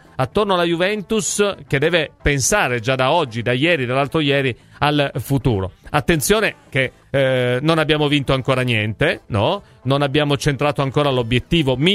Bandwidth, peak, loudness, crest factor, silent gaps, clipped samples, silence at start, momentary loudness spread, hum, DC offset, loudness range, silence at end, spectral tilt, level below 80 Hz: 15.5 kHz; 0 dBFS; -18 LUFS; 18 dB; none; under 0.1%; 0.2 s; 5 LU; none; under 0.1%; 1 LU; 0 s; -4.5 dB/octave; -38 dBFS